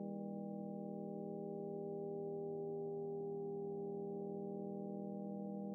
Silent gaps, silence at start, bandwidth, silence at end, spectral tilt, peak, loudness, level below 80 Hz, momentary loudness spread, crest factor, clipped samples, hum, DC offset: none; 0 s; 1.2 kHz; 0 s; -4 dB/octave; -36 dBFS; -46 LUFS; under -90 dBFS; 2 LU; 10 dB; under 0.1%; none; under 0.1%